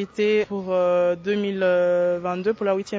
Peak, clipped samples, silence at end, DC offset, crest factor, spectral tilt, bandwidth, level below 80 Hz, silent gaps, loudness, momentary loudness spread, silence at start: -10 dBFS; under 0.1%; 0 s; under 0.1%; 12 dB; -6.5 dB/octave; 7.8 kHz; -62 dBFS; none; -22 LUFS; 5 LU; 0 s